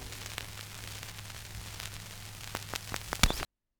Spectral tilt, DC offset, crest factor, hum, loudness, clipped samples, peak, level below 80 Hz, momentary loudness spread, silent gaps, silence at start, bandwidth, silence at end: -2.5 dB/octave; under 0.1%; 32 dB; none; -37 LUFS; under 0.1%; -6 dBFS; -42 dBFS; 14 LU; none; 0 s; over 20 kHz; 0.35 s